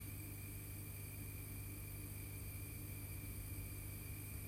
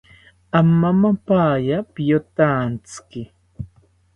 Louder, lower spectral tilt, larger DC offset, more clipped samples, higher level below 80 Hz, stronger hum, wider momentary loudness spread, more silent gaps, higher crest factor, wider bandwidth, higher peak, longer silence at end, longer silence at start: second, -49 LUFS vs -18 LUFS; second, -4.5 dB/octave vs -8 dB/octave; neither; neither; second, -56 dBFS vs -50 dBFS; first, 50 Hz at -50 dBFS vs none; second, 1 LU vs 21 LU; neither; second, 12 dB vs 18 dB; first, 16 kHz vs 10 kHz; second, -36 dBFS vs 0 dBFS; second, 0 s vs 0.5 s; second, 0 s vs 0.55 s